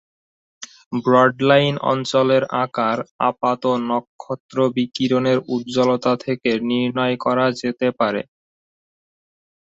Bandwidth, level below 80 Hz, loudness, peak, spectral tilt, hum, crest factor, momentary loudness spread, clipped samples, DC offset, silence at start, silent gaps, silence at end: 7.8 kHz; -62 dBFS; -19 LUFS; -2 dBFS; -6 dB/octave; none; 18 dB; 11 LU; under 0.1%; under 0.1%; 0.6 s; 0.86-0.91 s, 3.11-3.19 s, 4.07-4.19 s, 4.40-4.49 s; 1.4 s